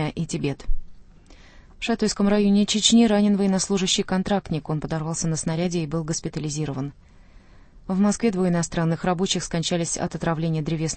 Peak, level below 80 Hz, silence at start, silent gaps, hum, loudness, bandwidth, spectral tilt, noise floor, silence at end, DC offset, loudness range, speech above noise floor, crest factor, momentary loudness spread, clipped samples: -4 dBFS; -38 dBFS; 0 s; none; none; -23 LUFS; 8.8 kHz; -4.5 dB/octave; -48 dBFS; 0 s; under 0.1%; 6 LU; 26 dB; 18 dB; 10 LU; under 0.1%